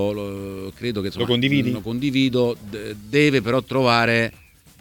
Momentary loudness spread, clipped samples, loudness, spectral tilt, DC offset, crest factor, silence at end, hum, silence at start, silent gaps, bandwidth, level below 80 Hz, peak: 14 LU; under 0.1%; -21 LUFS; -6 dB/octave; under 0.1%; 18 dB; 0.45 s; none; 0 s; none; 18.5 kHz; -50 dBFS; -4 dBFS